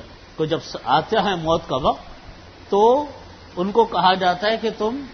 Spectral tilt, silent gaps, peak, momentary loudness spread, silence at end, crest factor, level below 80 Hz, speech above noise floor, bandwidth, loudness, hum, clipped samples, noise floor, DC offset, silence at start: -5.5 dB/octave; none; -2 dBFS; 13 LU; 0 s; 18 dB; -46 dBFS; 22 dB; 6.6 kHz; -20 LUFS; none; under 0.1%; -41 dBFS; under 0.1%; 0 s